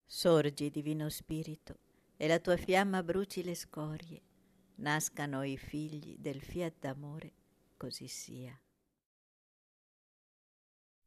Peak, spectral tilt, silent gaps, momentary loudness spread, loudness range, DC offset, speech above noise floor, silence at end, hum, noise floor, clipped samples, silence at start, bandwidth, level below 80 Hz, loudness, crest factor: -18 dBFS; -5 dB/octave; none; 19 LU; 15 LU; under 0.1%; 29 dB; 2.5 s; none; -65 dBFS; under 0.1%; 0.1 s; 14 kHz; -64 dBFS; -36 LUFS; 20 dB